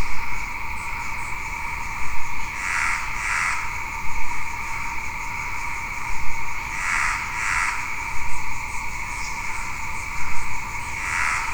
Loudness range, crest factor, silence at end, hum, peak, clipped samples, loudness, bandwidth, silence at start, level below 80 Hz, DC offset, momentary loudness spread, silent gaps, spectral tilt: 3 LU; 14 dB; 0 s; none; -6 dBFS; under 0.1%; -26 LUFS; over 20 kHz; 0 s; -36 dBFS; 0.7%; 7 LU; none; -2 dB/octave